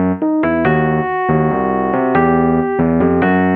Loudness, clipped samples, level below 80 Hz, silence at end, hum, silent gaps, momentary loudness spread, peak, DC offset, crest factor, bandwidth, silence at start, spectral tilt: -14 LUFS; under 0.1%; -38 dBFS; 0 s; none; none; 3 LU; 0 dBFS; under 0.1%; 12 dB; 4.2 kHz; 0 s; -11 dB/octave